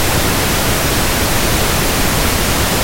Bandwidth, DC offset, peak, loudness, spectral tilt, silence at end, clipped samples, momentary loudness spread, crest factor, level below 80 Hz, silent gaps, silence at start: 16.5 kHz; under 0.1%; -2 dBFS; -14 LUFS; -3 dB/octave; 0 s; under 0.1%; 0 LU; 12 dB; -22 dBFS; none; 0 s